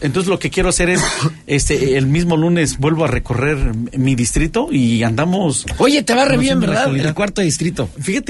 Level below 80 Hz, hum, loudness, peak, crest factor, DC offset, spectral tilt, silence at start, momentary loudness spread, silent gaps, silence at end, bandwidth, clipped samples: -28 dBFS; none; -16 LUFS; 0 dBFS; 14 dB; under 0.1%; -5 dB/octave; 0 s; 5 LU; none; 0 s; 12 kHz; under 0.1%